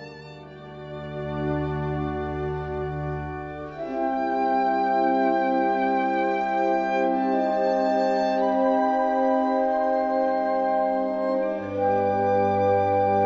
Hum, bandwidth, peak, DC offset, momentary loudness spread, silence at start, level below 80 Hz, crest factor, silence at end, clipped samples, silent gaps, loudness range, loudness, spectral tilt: none; 7.4 kHz; -10 dBFS; under 0.1%; 12 LU; 0 s; -48 dBFS; 14 dB; 0 s; under 0.1%; none; 7 LU; -24 LUFS; -8 dB/octave